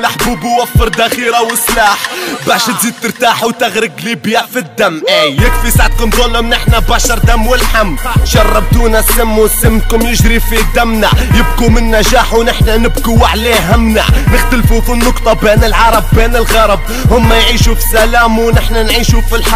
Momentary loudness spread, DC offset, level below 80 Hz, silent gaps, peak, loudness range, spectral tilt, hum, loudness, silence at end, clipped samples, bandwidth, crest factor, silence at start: 4 LU; under 0.1%; -12 dBFS; none; 0 dBFS; 2 LU; -4 dB/octave; none; -9 LUFS; 0 s; 0.5%; 16 kHz; 8 dB; 0 s